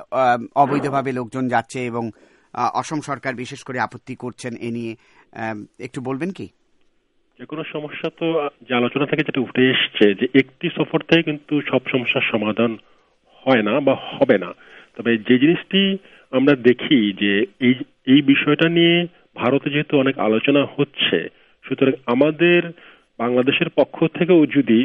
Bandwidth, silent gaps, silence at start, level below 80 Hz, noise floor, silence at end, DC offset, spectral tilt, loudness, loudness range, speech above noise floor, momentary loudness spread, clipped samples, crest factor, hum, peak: 11 kHz; none; 0 s; -64 dBFS; -62 dBFS; 0 s; under 0.1%; -6.5 dB/octave; -19 LUFS; 11 LU; 44 dB; 14 LU; under 0.1%; 20 dB; none; 0 dBFS